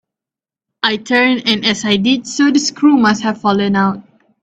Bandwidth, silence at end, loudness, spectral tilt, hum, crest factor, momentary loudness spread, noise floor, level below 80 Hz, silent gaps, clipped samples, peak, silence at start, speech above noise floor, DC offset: 8.4 kHz; 0.4 s; -14 LUFS; -4 dB/octave; none; 14 dB; 6 LU; -88 dBFS; -56 dBFS; none; under 0.1%; 0 dBFS; 0.85 s; 75 dB; under 0.1%